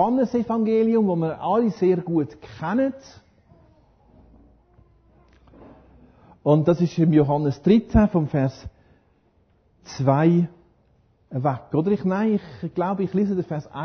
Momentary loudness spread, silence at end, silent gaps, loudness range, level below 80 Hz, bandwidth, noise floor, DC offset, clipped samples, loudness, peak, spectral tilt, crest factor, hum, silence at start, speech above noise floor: 10 LU; 0 s; none; 9 LU; -44 dBFS; 6.6 kHz; -62 dBFS; under 0.1%; under 0.1%; -22 LUFS; -4 dBFS; -9 dB/octave; 18 dB; none; 0 s; 41 dB